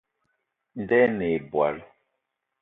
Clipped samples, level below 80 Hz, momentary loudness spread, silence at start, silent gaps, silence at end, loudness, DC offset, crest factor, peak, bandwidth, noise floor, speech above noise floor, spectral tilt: under 0.1%; -60 dBFS; 18 LU; 0.75 s; none; 0.75 s; -24 LUFS; under 0.1%; 20 dB; -8 dBFS; 4 kHz; -80 dBFS; 57 dB; -10 dB/octave